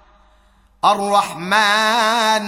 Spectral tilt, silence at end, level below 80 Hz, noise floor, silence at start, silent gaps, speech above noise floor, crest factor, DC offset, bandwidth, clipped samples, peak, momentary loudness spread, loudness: -2 dB/octave; 0 s; -58 dBFS; -53 dBFS; 0.85 s; none; 37 dB; 16 dB; under 0.1%; 17 kHz; under 0.1%; -2 dBFS; 4 LU; -16 LUFS